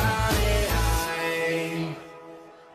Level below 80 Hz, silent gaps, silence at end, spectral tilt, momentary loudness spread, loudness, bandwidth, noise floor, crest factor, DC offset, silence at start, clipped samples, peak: -32 dBFS; none; 0.1 s; -4.5 dB/octave; 19 LU; -25 LUFS; 14.5 kHz; -46 dBFS; 16 dB; under 0.1%; 0 s; under 0.1%; -10 dBFS